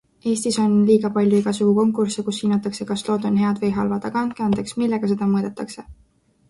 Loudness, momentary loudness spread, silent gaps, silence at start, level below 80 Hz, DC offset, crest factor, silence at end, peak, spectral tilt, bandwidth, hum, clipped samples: -20 LUFS; 8 LU; none; 0.25 s; -54 dBFS; under 0.1%; 16 dB; 0.55 s; -6 dBFS; -6 dB/octave; 11.5 kHz; none; under 0.1%